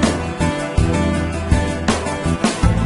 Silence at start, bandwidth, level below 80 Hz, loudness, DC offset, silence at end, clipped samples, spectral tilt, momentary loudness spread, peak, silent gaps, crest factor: 0 s; 11.5 kHz; -24 dBFS; -19 LUFS; under 0.1%; 0 s; under 0.1%; -5.5 dB/octave; 3 LU; -2 dBFS; none; 16 dB